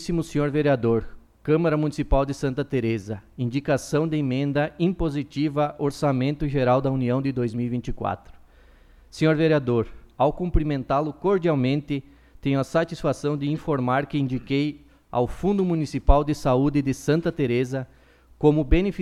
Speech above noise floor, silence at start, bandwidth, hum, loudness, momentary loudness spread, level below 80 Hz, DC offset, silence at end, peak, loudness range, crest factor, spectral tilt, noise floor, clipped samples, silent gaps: 29 dB; 0 s; 13 kHz; none; -24 LUFS; 8 LU; -34 dBFS; under 0.1%; 0 s; -2 dBFS; 2 LU; 22 dB; -7.5 dB/octave; -52 dBFS; under 0.1%; none